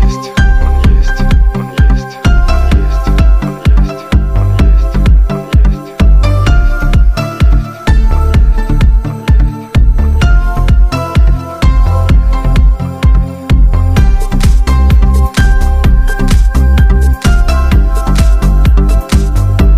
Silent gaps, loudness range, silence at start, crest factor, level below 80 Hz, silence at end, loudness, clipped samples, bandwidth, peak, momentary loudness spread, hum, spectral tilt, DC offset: none; 1 LU; 0 s; 6 dB; -8 dBFS; 0 s; -11 LUFS; under 0.1%; 12.5 kHz; 0 dBFS; 3 LU; none; -6.5 dB/octave; under 0.1%